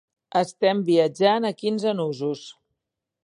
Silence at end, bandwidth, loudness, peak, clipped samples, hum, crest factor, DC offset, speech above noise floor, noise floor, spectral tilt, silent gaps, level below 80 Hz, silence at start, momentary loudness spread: 0.7 s; 11 kHz; -23 LUFS; -6 dBFS; under 0.1%; none; 18 dB; under 0.1%; 61 dB; -83 dBFS; -6 dB/octave; none; -76 dBFS; 0.35 s; 9 LU